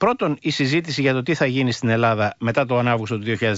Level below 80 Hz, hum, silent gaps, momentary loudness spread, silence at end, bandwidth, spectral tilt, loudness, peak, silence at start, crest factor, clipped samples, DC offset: -56 dBFS; none; none; 3 LU; 0 s; 8 kHz; -6 dB/octave; -20 LUFS; -6 dBFS; 0 s; 14 dB; under 0.1%; under 0.1%